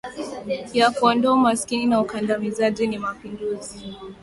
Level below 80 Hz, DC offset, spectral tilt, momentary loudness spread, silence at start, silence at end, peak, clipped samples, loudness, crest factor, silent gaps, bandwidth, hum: -56 dBFS; under 0.1%; -4.5 dB/octave; 15 LU; 0.05 s; 0.1 s; -4 dBFS; under 0.1%; -22 LUFS; 18 dB; none; 11.5 kHz; none